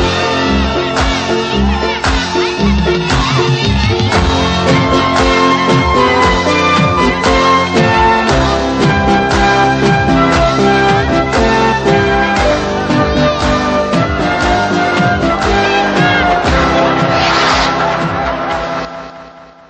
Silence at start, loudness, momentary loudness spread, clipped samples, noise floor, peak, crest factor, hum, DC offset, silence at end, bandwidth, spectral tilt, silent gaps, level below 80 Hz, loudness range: 0 s; -11 LUFS; 4 LU; under 0.1%; -35 dBFS; 0 dBFS; 12 dB; none; under 0.1%; 0.25 s; 9.2 kHz; -5 dB/octave; none; -24 dBFS; 2 LU